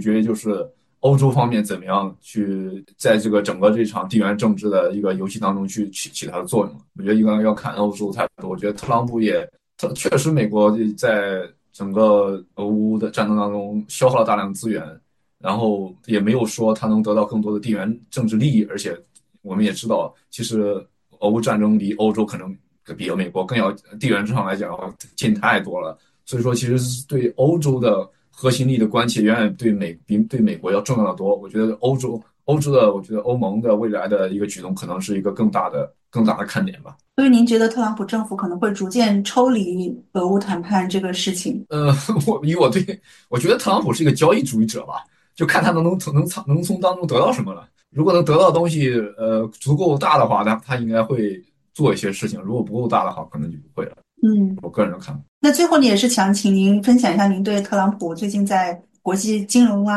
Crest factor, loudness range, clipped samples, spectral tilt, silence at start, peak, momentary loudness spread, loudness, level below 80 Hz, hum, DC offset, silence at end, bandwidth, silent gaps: 18 dB; 4 LU; under 0.1%; -6 dB/octave; 0 s; -2 dBFS; 12 LU; -19 LUFS; -58 dBFS; none; under 0.1%; 0 s; 12.5 kHz; 55.28-55.41 s